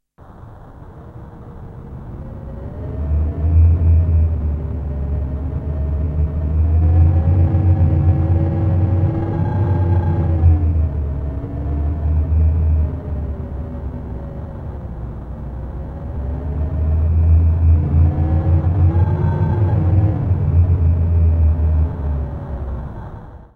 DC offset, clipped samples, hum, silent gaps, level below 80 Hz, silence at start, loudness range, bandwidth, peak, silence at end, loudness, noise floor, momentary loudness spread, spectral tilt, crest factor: under 0.1%; under 0.1%; none; none; -22 dBFS; 0.2 s; 9 LU; 2.7 kHz; -2 dBFS; 0.1 s; -18 LUFS; -40 dBFS; 16 LU; -12 dB/octave; 14 dB